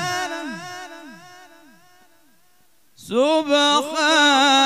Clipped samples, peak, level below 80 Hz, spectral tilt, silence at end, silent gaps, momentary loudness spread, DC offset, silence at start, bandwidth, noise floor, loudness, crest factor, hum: under 0.1%; -6 dBFS; -74 dBFS; -1.5 dB/octave; 0 s; none; 21 LU; 0.2%; 0 s; 15.5 kHz; -61 dBFS; -17 LUFS; 16 dB; none